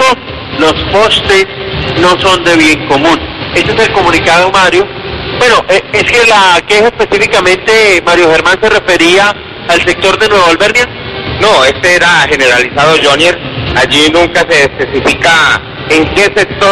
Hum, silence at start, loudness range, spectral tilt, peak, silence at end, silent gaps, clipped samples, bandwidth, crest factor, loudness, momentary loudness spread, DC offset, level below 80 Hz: none; 0 s; 2 LU; -3.5 dB/octave; 0 dBFS; 0 s; none; 0.6%; 15 kHz; 8 dB; -7 LUFS; 7 LU; 0.7%; -30 dBFS